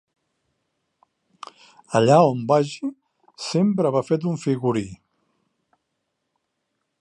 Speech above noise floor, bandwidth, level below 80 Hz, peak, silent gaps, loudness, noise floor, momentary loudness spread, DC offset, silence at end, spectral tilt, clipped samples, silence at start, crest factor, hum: 57 dB; 11 kHz; -64 dBFS; -4 dBFS; none; -21 LUFS; -77 dBFS; 24 LU; under 0.1%; 2.05 s; -6.5 dB/octave; under 0.1%; 1.9 s; 20 dB; none